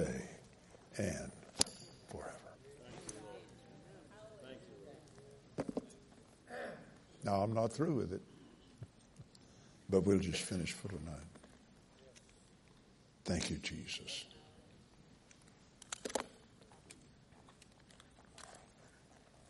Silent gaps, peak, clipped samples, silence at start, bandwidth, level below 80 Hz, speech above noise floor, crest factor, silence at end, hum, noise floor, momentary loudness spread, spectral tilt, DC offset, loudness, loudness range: none; -6 dBFS; under 0.1%; 0 s; 11.5 kHz; -66 dBFS; 27 dB; 38 dB; 0.1 s; none; -65 dBFS; 26 LU; -4.5 dB/octave; under 0.1%; -41 LUFS; 12 LU